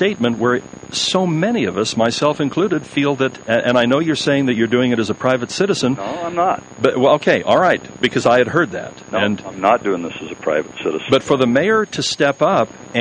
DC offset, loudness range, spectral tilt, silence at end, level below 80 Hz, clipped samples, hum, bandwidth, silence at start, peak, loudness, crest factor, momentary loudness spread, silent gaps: under 0.1%; 2 LU; -5 dB/octave; 0 s; -54 dBFS; under 0.1%; none; 10 kHz; 0 s; -2 dBFS; -17 LUFS; 16 dB; 7 LU; none